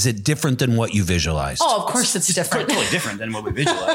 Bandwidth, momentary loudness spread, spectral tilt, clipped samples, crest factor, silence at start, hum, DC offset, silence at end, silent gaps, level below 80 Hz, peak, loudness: 17 kHz; 4 LU; -3.5 dB/octave; under 0.1%; 16 dB; 0 s; none; under 0.1%; 0 s; none; -40 dBFS; -4 dBFS; -20 LUFS